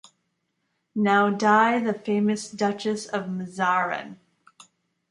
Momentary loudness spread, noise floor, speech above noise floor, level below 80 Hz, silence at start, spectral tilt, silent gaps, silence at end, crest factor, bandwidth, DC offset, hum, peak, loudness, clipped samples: 12 LU; -75 dBFS; 52 dB; -72 dBFS; 0.95 s; -5.5 dB/octave; none; 0.95 s; 20 dB; 11.5 kHz; under 0.1%; none; -6 dBFS; -23 LUFS; under 0.1%